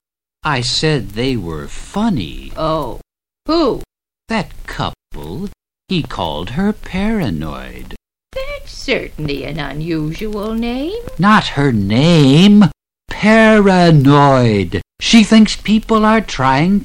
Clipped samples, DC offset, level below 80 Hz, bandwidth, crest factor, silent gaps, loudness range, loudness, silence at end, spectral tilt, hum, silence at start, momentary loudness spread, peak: under 0.1%; under 0.1%; -32 dBFS; 15.5 kHz; 14 dB; none; 12 LU; -14 LUFS; 0 s; -6 dB/octave; none; 0.45 s; 18 LU; 0 dBFS